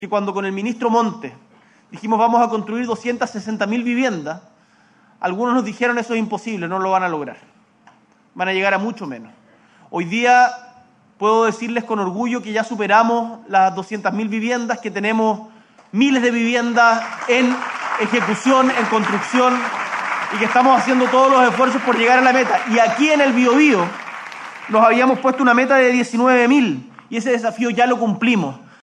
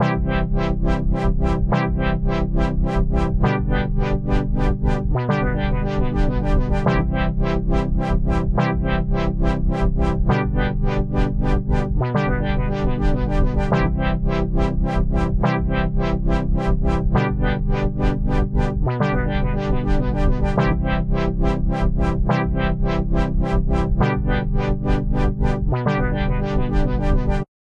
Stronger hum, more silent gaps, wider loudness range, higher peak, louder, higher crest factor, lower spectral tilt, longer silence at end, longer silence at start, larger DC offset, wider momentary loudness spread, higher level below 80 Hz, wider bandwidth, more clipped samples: neither; neither; first, 7 LU vs 0 LU; first, 0 dBFS vs -4 dBFS; first, -17 LUFS vs -21 LUFS; about the same, 18 dB vs 14 dB; second, -4.5 dB/octave vs -8.5 dB/octave; about the same, 0.25 s vs 0.15 s; about the same, 0 s vs 0 s; neither; first, 12 LU vs 2 LU; second, -72 dBFS vs -22 dBFS; first, 10.5 kHz vs 7 kHz; neither